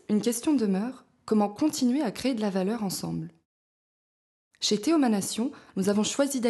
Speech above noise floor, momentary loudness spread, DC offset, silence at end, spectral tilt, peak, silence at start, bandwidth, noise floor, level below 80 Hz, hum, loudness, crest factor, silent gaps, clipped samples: over 64 dB; 8 LU; under 0.1%; 0 s; -4.5 dB/octave; -12 dBFS; 0.1 s; 12.5 kHz; under -90 dBFS; -68 dBFS; none; -27 LUFS; 16 dB; 3.45-4.51 s; under 0.1%